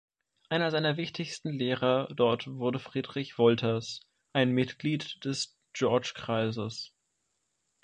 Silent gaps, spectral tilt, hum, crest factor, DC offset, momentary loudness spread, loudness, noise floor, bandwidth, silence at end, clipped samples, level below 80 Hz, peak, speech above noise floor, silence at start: none; -5.5 dB/octave; none; 20 dB; under 0.1%; 10 LU; -30 LUFS; -79 dBFS; 9.4 kHz; 0.95 s; under 0.1%; -70 dBFS; -10 dBFS; 49 dB; 0.5 s